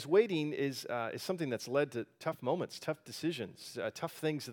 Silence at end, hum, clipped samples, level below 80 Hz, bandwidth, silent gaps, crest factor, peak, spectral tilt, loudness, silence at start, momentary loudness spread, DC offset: 0 s; none; under 0.1%; -84 dBFS; 19 kHz; none; 20 dB; -16 dBFS; -5.5 dB/octave; -36 LUFS; 0 s; 7 LU; under 0.1%